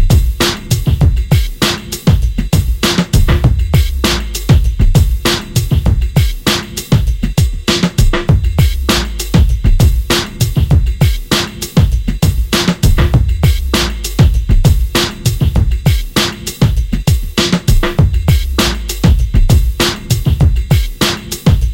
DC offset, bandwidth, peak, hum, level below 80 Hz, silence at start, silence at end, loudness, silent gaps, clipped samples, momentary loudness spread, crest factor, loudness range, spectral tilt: under 0.1%; 17 kHz; 0 dBFS; none; -14 dBFS; 0 s; 0 s; -13 LUFS; none; under 0.1%; 3 LU; 10 dB; 1 LU; -5 dB/octave